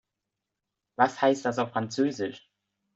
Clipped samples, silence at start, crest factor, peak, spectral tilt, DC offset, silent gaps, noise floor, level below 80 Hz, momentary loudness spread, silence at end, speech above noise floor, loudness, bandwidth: under 0.1%; 1 s; 22 dB; -6 dBFS; -5 dB/octave; under 0.1%; none; -86 dBFS; -74 dBFS; 11 LU; 0.6 s; 59 dB; -27 LUFS; 8 kHz